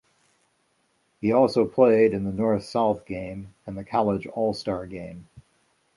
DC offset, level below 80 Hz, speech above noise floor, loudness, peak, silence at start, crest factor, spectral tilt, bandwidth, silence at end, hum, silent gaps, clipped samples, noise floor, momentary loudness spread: under 0.1%; -54 dBFS; 45 dB; -24 LUFS; -4 dBFS; 1.2 s; 20 dB; -7.5 dB/octave; 11.5 kHz; 0.55 s; none; none; under 0.1%; -69 dBFS; 19 LU